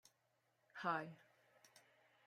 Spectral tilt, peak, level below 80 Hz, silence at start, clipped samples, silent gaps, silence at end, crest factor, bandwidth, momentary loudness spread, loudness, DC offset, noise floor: -5 dB/octave; -28 dBFS; under -90 dBFS; 0.75 s; under 0.1%; none; 0.5 s; 24 dB; 16 kHz; 24 LU; -45 LUFS; under 0.1%; -83 dBFS